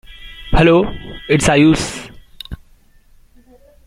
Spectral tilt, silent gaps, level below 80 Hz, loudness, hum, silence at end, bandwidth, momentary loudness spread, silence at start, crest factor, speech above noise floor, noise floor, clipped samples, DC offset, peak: -5.5 dB/octave; none; -28 dBFS; -14 LUFS; none; 1.3 s; 15.5 kHz; 24 LU; 0.1 s; 16 dB; 36 dB; -49 dBFS; under 0.1%; under 0.1%; 0 dBFS